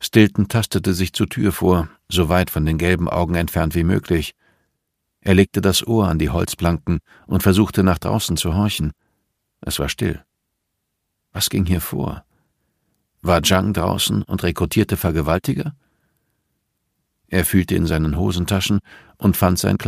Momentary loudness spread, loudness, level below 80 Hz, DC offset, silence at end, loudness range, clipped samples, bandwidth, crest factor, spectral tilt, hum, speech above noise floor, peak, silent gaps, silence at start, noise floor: 9 LU; -19 LUFS; -34 dBFS; under 0.1%; 0 s; 6 LU; under 0.1%; 15.5 kHz; 20 dB; -5.5 dB/octave; none; 57 dB; 0 dBFS; none; 0 s; -75 dBFS